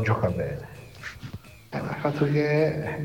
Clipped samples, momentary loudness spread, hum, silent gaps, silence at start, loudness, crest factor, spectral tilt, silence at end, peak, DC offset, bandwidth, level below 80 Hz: under 0.1%; 18 LU; none; none; 0 s; -26 LUFS; 18 dB; -8 dB/octave; 0 s; -8 dBFS; 0.1%; 17 kHz; -50 dBFS